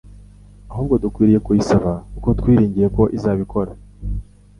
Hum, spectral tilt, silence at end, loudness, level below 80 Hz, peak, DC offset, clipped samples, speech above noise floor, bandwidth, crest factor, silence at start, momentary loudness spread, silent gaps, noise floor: 50 Hz at -30 dBFS; -8.5 dB/octave; 0.4 s; -18 LUFS; -32 dBFS; -2 dBFS; under 0.1%; under 0.1%; 26 dB; 11 kHz; 16 dB; 0.05 s; 15 LU; none; -42 dBFS